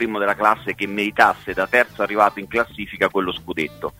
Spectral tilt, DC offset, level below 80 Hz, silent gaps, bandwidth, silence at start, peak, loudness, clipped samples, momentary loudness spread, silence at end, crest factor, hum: -5 dB/octave; under 0.1%; -52 dBFS; none; 16 kHz; 0 s; 0 dBFS; -20 LUFS; under 0.1%; 9 LU; 0.1 s; 20 dB; none